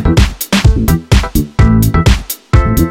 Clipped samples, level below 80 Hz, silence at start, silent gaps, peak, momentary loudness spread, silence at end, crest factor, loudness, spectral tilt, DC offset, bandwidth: 0.3%; -14 dBFS; 0 s; none; 0 dBFS; 4 LU; 0 s; 10 dB; -11 LUFS; -5.5 dB/octave; under 0.1%; 17.5 kHz